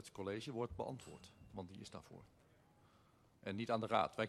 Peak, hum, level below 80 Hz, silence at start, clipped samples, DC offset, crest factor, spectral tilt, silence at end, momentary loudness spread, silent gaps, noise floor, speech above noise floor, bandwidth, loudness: -20 dBFS; none; -70 dBFS; 0 s; under 0.1%; under 0.1%; 26 dB; -5.5 dB/octave; 0 s; 20 LU; none; -71 dBFS; 27 dB; 13 kHz; -44 LUFS